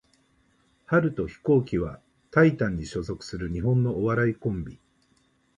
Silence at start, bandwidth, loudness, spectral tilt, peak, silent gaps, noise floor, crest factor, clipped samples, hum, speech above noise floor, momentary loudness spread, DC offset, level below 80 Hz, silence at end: 0.9 s; 10.5 kHz; -26 LUFS; -8 dB/octave; -6 dBFS; none; -66 dBFS; 20 dB; under 0.1%; none; 41 dB; 12 LU; under 0.1%; -46 dBFS; 0.8 s